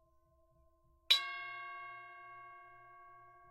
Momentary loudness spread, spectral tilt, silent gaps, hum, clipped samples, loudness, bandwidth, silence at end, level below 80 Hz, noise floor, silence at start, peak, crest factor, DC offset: 27 LU; 1.5 dB/octave; none; none; under 0.1%; -34 LUFS; 16 kHz; 0 s; -78 dBFS; -71 dBFS; 1.1 s; -14 dBFS; 30 dB; under 0.1%